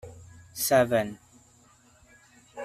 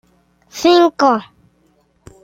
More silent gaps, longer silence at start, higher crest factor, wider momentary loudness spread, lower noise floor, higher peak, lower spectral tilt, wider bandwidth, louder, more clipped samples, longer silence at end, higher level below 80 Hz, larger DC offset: neither; second, 0.05 s vs 0.55 s; first, 22 dB vs 16 dB; first, 25 LU vs 11 LU; about the same, -59 dBFS vs -58 dBFS; second, -8 dBFS vs -2 dBFS; about the same, -4 dB/octave vs -4 dB/octave; about the same, 15.5 kHz vs 15.5 kHz; second, -25 LUFS vs -14 LUFS; neither; second, 0 s vs 1 s; about the same, -62 dBFS vs -58 dBFS; neither